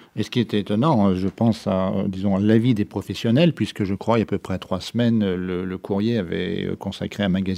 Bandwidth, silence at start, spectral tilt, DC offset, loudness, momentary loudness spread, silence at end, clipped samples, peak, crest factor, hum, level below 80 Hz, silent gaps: 13.5 kHz; 0.15 s; -7.5 dB/octave; under 0.1%; -22 LUFS; 9 LU; 0 s; under 0.1%; -4 dBFS; 18 dB; none; -56 dBFS; none